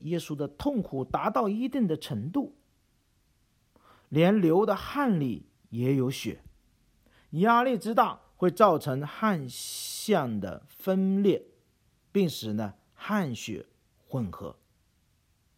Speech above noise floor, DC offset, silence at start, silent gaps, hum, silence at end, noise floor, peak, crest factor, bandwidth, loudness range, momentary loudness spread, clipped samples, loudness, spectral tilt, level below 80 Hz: 42 dB; under 0.1%; 0 s; none; none; 1.05 s; -69 dBFS; -6 dBFS; 22 dB; 16.5 kHz; 6 LU; 15 LU; under 0.1%; -28 LUFS; -6 dB/octave; -60 dBFS